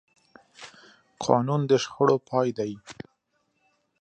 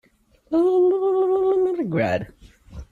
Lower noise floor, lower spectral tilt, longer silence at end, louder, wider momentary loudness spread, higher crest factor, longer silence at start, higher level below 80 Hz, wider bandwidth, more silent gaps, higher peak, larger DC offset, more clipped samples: first, -73 dBFS vs -54 dBFS; second, -6 dB/octave vs -8.5 dB/octave; first, 1.1 s vs 0.1 s; second, -25 LUFS vs -21 LUFS; first, 23 LU vs 7 LU; first, 22 dB vs 12 dB; about the same, 0.6 s vs 0.5 s; second, -68 dBFS vs -50 dBFS; first, 9.2 kHz vs 7.2 kHz; neither; first, -4 dBFS vs -10 dBFS; neither; neither